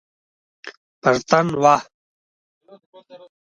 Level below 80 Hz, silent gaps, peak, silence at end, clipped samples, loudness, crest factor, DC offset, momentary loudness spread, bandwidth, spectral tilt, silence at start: -62 dBFS; 0.77-1.02 s, 1.94-2.61 s, 2.86-2.93 s; 0 dBFS; 0.25 s; under 0.1%; -18 LUFS; 22 dB; under 0.1%; 24 LU; 10.5 kHz; -5 dB/octave; 0.65 s